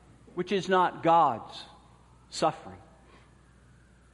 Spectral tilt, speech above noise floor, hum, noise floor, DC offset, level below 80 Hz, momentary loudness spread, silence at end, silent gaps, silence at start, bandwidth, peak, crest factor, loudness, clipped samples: -5 dB/octave; 31 dB; none; -58 dBFS; under 0.1%; -62 dBFS; 22 LU; 1.35 s; none; 0.35 s; 11.5 kHz; -10 dBFS; 20 dB; -27 LUFS; under 0.1%